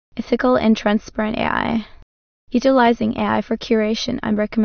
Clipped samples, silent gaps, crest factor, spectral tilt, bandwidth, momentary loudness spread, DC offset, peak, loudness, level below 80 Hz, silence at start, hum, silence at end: under 0.1%; 2.02-2.47 s; 16 dB; -5.5 dB/octave; 6.6 kHz; 8 LU; under 0.1%; -4 dBFS; -19 LUFS; -44 dBFS; 0.15 s; none; 0 s